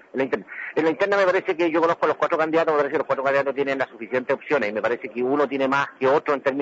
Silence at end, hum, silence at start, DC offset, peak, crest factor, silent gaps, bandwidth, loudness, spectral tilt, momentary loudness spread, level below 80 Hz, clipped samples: 0 s; none; 0.15 s; under 0.1%; -8 dBFS; 14 dB; none; 7.8 kHz; -22 LUFS; -6 dB/octave; 6 LU; -72 dBFS; under 0.1%